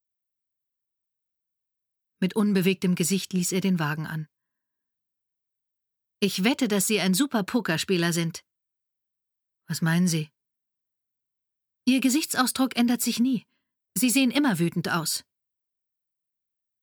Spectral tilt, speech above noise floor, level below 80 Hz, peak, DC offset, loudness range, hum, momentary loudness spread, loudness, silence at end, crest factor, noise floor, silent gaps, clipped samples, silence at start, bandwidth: -4.5 dB/octave; 61 dB; -72 dBFS; -8 dBFS; under 0.1%; 5 LU; none; 9 LU; -25 LUFS; 1.6 s; 18 dB; -85 dBFS; none; under 0.1%; 2.2 s; over 20 kHz